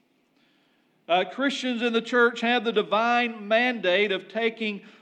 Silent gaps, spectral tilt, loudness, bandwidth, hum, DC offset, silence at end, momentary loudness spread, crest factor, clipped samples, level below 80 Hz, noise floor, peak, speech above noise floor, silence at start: none; -4 dB/octave; -24 LUFS; 9.4 kHz; none; under 0.1%; 0.1 s; 5 LU; 18 dB; under 0.1%; under -90 dBFS; -66 dBFS; -8 dBFS; 41 dB; 1.1 s